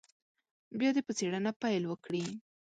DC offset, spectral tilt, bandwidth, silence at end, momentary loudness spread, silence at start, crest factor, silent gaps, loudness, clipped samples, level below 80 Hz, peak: under 0.1%; -5 dB/octave; 9.2 kHz; 0.3 s; 11 LU; 0.7 s; 16 dB; 1.56-1.60 s; -34 LUFS; under 0.1%; -80 dBFS; -20 dBFS